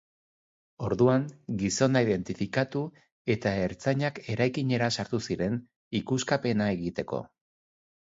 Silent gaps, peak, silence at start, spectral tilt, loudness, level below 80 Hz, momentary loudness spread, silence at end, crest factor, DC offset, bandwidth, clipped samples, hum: 3.12-3.25 s, 5.76-5.91 s; -10 dBFS; 0.8 s; -5.5 dB/octave; -29 LUFS; -56 dBFS; 11 LU; 0.75 s; 20 dB; under 0.1%; 7.8 kHz; under 0.1%; none